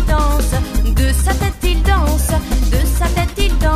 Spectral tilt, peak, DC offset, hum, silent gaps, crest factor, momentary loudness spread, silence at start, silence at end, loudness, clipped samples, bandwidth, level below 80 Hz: -5 dB/octave; 0 dBFS; 0.2%; none; none; 12 dB; 3 LU; 0 s; 0 s; -16 LUFS; under 0.1%; 15.5 kHz; -14 dBFS